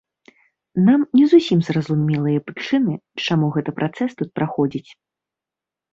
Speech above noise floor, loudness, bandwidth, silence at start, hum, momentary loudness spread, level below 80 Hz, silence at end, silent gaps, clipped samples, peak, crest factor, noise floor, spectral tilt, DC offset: 69 dB; -19 LUFS; 7.6 kHz; 0.75 s; none; 11 LU; -62 dBFS; 1.1 s; none; under 0.1%; -2 dBFS; 16 dB; -88 dBFS; -7.5 dB/octave; under 0.1%